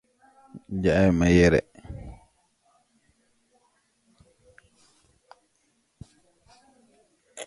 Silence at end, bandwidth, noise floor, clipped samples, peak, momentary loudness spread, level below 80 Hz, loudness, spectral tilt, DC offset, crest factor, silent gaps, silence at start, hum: 0.05 s; 11.5 kHz; -70 dBFS; under 0.1%; -6 dBFS; 26 LU; -44 dBFS; -21 LUFS; -6.5 dB/octave; under 0.1%; 22 dB; none; 0.55 s; none